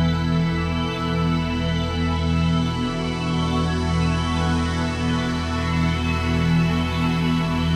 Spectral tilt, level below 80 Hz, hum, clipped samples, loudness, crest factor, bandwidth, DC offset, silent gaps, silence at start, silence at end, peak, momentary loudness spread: -6.5 dB/octave; -32 dBFS; none; under 0.1%; -22 LUFS; 12 dB; 10.5 kHz; under 0.1%; none; 0 s; 0 s; -10 dBFS; 3 LU